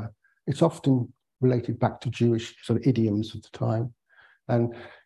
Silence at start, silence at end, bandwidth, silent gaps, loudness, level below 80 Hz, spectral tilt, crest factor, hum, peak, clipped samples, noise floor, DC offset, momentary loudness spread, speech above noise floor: 0 s; 0.15 s; 11.5 kHz; none; -26 LUFS; -56 dBFS; -8 dB/octave; 18 dB; none; -8 dBFS; under 0.1%; -59 dBFS; under 0.1%; 13 LU; 34 dB